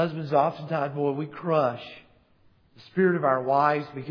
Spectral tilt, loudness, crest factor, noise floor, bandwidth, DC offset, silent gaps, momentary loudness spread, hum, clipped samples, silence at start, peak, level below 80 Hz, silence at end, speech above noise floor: -9 dB/octave; -25 LUFS; 18 dB; -61 dBFS; 5.4 kHz; under 0.1%; none; 9 LU; none; under 0.1%; 0 s; -8 dBFS; -70 dBFS; 0 s; 35 dB